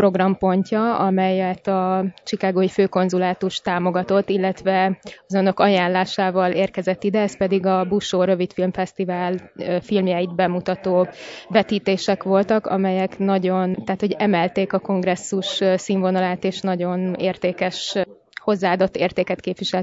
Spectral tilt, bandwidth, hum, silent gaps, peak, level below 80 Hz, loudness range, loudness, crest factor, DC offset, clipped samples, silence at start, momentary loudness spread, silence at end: -6 dB/octave; 7.8 kHz; none; none; -2 dBFS; -58 dBFS; 2 LU; -21 LUFS; 18 dB; under 0.1%; under 0.1%; 0 s; 5 LU; 0 s